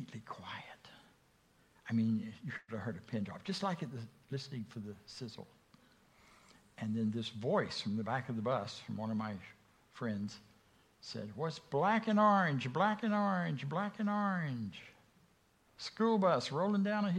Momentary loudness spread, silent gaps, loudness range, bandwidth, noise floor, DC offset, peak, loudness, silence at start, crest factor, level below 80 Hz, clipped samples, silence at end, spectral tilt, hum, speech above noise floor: 17 LU; none; 10 LU; 10.5 kHz; -71 dBFS; under 0.1%; -16 dBFS; -36 LUFS; 0 s; 20 dB; -76 dBFS; under 0.1%; 0 s; -6.5 dB/octave; none; 35 dB